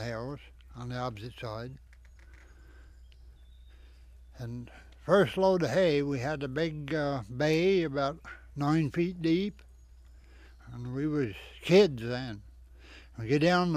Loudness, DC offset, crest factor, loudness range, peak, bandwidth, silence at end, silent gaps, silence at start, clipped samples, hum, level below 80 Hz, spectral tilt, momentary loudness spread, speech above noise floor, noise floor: -29 LUFS; under 0.1%; 20 dB; 16 LU; -10 dBFS; 15 kHz; 0 s; none; 0 s; under 0.1%; none; -54 dBFS; -6.5 dB/octave; 19 LU; 25 dB; -54 dBFS